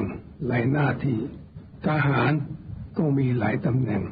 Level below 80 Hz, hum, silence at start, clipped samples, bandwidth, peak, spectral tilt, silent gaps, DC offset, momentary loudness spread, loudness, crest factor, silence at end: -50 dBFS; none; 0 s; under 0.1%; 5 kHz; -10 dBFS; -7.5 dB/octave; none; under 0.1%; 13 LU; -25 LUFS; 14 dB; 0 s